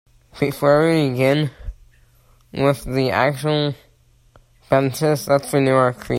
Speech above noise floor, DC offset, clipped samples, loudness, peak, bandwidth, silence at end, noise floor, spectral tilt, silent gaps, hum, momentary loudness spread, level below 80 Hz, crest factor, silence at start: 37 dB; under 0.1%; under 0.1%; -19 LUFS; -2 dBFS; 16 kHz; 0 s; -55 dBFS; -6 dB/octave; none; none; 10 LU; -44 dBFS; 18 dB; 0.35 s